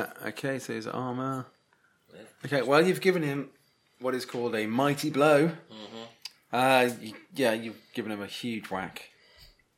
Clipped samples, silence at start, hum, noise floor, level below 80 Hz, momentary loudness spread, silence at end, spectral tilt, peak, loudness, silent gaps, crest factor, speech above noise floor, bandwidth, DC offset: under 0.1%; 0 s; none; -67 dBFS; -74 dBFS; 21 LU; 0.3 s; -5 dB/octave; -6 dBFS; -28 LUFS; none; 22 dB; 39 dB; 16.5 kHz; under 0.1%